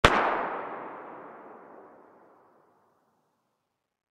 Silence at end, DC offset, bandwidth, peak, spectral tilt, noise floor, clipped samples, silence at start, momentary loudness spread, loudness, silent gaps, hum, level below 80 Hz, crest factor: 2.3 s; under 0.1%; 15.5 kHz; -2 dBFS; -4 dB/octave; -80 dBFS; under 0.1%; 0.05 s; 25 LU; -29 LUFS; none; none; -44 dBFS; 30 dB